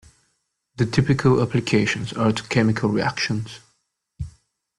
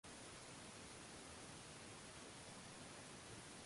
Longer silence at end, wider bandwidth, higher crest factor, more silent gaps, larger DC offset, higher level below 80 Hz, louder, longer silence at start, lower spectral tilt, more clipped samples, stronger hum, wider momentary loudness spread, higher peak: first, 0.5 s vs 0 s; about the same, 11.5 kHz vs 11.5 kHz; first, 18 dB vs 12 dB; neither; neither; first, -48 dBFS vs -74 dBFS; first, -21 LUFS vs -56 LUFS; first, 0.8 s vs 0.05 s; first, -6 dB/octave vs -3 dB/octave; neither; neither; first, 18 LU vs 0 LU; first, -4 dBFS vs -44 dBFS